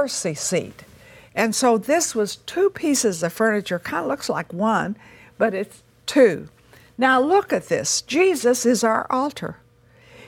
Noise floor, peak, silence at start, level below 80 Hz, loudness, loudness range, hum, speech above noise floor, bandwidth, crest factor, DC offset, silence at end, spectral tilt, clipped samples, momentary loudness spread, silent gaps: -53 dBFS; -4 dBFS; 0 s; -60 dBFS; -21 LUFS; 3 LU; none; 32 dB; 18 kHz; 18 dB; under 0.1%; 0 s; -3.5 dB/octave; under 0.1%; 12 LU; none